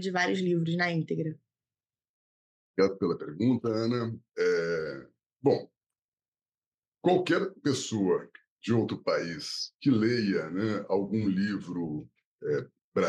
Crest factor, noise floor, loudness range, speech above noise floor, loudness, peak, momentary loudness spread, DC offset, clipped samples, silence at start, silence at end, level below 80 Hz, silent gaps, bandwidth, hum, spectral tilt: 20 dB; under -90 dBFS; 3 LU; over 61 dB; -30 LUFS; -10 dBFS; 8 LU; under 0.1%; under 0.1%; 0 s; 0 s; -74 dBFS; 2.09-2.74 s, 6.04-6.12 s, 6.28-6.32 s, 6.58-6.78 s, 6.88-6.92 s, 8.50-8.57 s, 12.25-12.38 s, 12.84-12.92 s; 12 kHz; none; -6 dB/octave